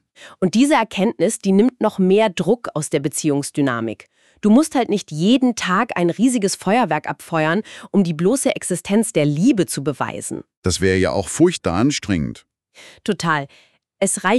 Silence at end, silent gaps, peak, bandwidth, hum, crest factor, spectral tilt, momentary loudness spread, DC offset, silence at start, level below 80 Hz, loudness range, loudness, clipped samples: 0 s; 10.57-10.62 s; -2 dBFS; 13.5 kHz; none; 16 dB; -5 dB/octave; 8 LU; under 0.1%; 0.2 s; -50 dBFS; 2 LU; -19 LUFS; under 0.1%